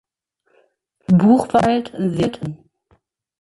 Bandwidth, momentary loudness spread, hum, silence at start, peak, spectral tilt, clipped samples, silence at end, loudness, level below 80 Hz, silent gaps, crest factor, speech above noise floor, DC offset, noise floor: 11.5 kHz; 17 LU; none; 1.1 s; -2 dBFS; -8 dB/octave; under 0.1%; 0.85 s; -17 LUFS; -50 dBFS; none; 16 dB; 51 dB; under 0.1%; -67 dBFS